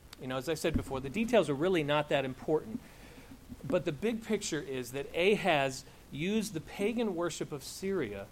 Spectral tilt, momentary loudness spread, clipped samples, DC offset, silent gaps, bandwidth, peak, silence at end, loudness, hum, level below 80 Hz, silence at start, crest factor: -5 dB/octave; 16 LU; under 0.1%; under 0.1%; none; 16.5 kHz; -14 dBFS; 0 s; -33 LUFS; none; -54 dBFS; 0.05 s; 20 dB